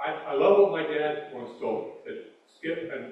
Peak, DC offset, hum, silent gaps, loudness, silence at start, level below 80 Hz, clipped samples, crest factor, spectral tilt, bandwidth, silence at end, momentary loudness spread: -8 dBFS; under 0.1%; none; none; -26 LUFS; 0 s; -78 dBFS; under 0.1%; 20 dB; -7 dB/octave; 5.6 kHz; 0 s; 19 LU